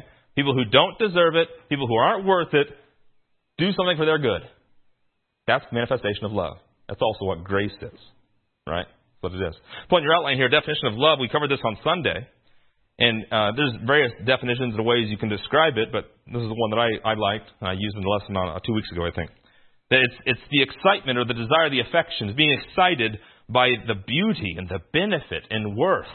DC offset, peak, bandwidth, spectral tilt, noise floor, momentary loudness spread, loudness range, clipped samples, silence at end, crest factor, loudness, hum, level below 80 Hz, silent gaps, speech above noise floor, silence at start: under 0.1%; -2 dBFS; 4.4 kHz; -10 dB/octave; -71 dBFS; 12 LU; 6 LU; under 0.1%; 0 s; 22 dB; -22 LUFS; none; -54 dBFS; none; 48 dB; 0.35 s